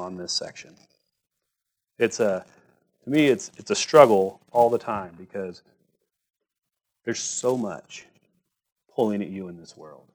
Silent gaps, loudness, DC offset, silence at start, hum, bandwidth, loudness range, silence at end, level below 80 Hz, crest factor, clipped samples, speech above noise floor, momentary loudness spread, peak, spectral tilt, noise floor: 8.72-8.76 s; -23 LUFS; under 0.1%; 0 s; none; over 20 kHz; 11 LU; 0.25 s; -70 dBFS; 26 dB; under 0.1%; 59 dB; 22 LU; 0 dBFS; -4 dB/octave; -83 dBFS